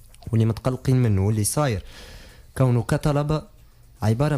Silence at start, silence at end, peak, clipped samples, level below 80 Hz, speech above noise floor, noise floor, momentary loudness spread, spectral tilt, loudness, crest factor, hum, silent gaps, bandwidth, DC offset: 0.25 s; 0 s; -10 dBFS; under 0.1%; -42 dBFS; 28 dB; -49 dBFS; 15 LU; -6.5 dB/octave; -23 LUFS; 14 dB; none; none; 14.5 kHz; under 0.1%